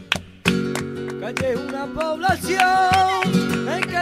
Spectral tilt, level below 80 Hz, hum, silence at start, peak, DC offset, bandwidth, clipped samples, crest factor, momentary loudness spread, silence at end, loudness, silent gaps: -4.5 dB/octave; -48 dBFS; none; 0 s; -2 dBFS; under 0.1%; 16 kHz; under 0.1%; 18 dB; 11 LU; 0 s; -21 LUFS; none